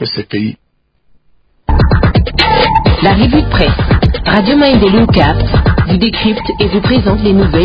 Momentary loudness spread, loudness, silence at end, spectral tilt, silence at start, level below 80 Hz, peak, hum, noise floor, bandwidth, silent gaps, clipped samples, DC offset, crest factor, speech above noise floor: 7 LU; -10 LUFS; 0 s; -8.5 dB/octave; 0 s; -18 dBFS; 0 dBFS; none; -54 dBFS; 8 kHz; none; under 0.1%; under 0.1%; 10 dB; 45 dB